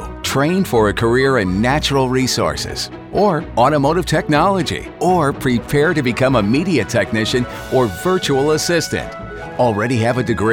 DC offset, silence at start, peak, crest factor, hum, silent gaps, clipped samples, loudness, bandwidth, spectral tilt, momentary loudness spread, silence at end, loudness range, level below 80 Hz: under 0.1%; 0 s; -2 dBFS; 14 dB; none; none; under 0.1%; -16 LUFS; 19 kHz; -5 dB/octave; 6 LU; 0 s; 2 LU; -36 dBFS